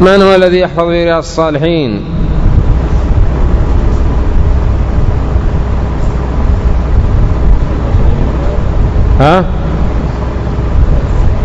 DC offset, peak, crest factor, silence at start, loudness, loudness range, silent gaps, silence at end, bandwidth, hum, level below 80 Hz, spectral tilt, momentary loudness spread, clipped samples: under 0.1%; 0 dBFS; 8 dB; 0 s; -12 LUFS; 2 LU; none; 0 s; 7.8 kHz; none; -12 dBFS; -7.5 dB/octave; 7 LU; 2%